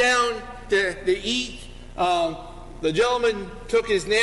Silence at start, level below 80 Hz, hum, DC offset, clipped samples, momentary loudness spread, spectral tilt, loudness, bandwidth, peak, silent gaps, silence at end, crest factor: 0 s; -42 dBFS; none; under 0.1%; under 0.1%; 14 LU; -3 dB/octave; -23 LUFS; 11.5 kHz; -10 dBFS; none; 0 s; 14 dB